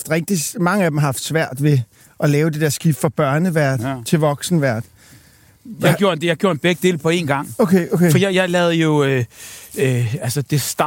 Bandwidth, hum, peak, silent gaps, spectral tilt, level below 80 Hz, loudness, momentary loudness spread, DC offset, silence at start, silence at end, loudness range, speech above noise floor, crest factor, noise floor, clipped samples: 17 kHz; none; -2 dBFS; none; -5.5 dB/octave; -56 dBFS; -17 LUFS; 6 LU; under 0.1%; 0 s; 0 s; 3 LU; 32 dB; 16 dB; -49 dBFS; under 0.1%